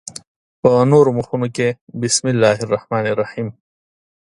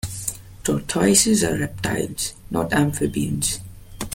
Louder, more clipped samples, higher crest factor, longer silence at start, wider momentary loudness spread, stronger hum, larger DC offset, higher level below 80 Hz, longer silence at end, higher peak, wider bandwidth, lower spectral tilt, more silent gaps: first, -17 LUFS vs -21 LUFS; neither; about the same, 18 dB vs 20 dB; first, 0.65 s vs 0.05 s; about the same, 14 LU vs 13 LU; neither; neither; second, -56 dBFS vs -42 dBFS; first, 0.7 s vs 0 s; about the same, 0 dBFS vs -2 dBFS; second, 11.5 kHz vs 17 kHz; about the same, -5 dB/octave vs -4 dB/octave; first, 1.81-1.87 s vs none